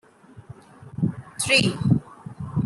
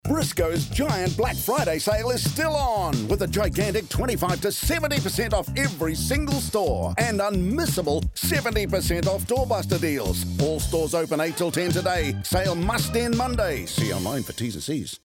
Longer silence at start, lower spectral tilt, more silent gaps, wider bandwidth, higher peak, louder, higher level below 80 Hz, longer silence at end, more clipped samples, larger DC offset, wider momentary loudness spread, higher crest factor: first, 0.35 s vs 0.05 s; about the same, -4.5 dB/octave vs -4.5 dB/octave; neither; second, 12.5 kHz vs 17.5 kHz; first, -6 dBFS vs -10 dBFS; about the same, -22 LUFS vs -24 LUFS; second, -54 dBFS vs -36 dBFS; about the same, 0 s vs 0.1 s; neither; neither; first, 20 LU vs 2 LU; first, 20 dB vs 14 dB